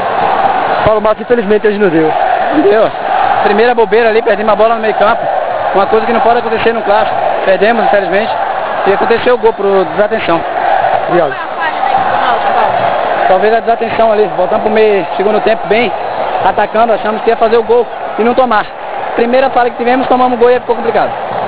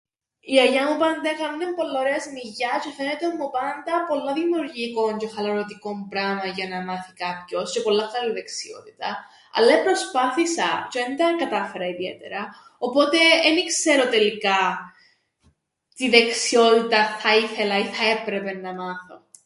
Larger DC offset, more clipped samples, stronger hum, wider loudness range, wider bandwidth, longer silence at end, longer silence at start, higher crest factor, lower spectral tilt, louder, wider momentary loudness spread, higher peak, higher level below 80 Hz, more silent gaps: first, 4% vs under 0.1%; first, 0.4% vs under 0.1%; neither; second, 2 LU vs 7 LU; second, 4 kHz vs 11.5 kHz; second, 0 s vs 0.3 s; second, 0 s vs 0.45 s; second, 10 dB vs 22 dB; first, -9 dB/octave vs -2.5 dB/octave; first, -10 LUFS vs -22 LUFS; second, 4 LU vs 14 LU; about the same, 0 dBFS vs 0 dBFS; first, -42 dBFS vs -72 dBFS; neither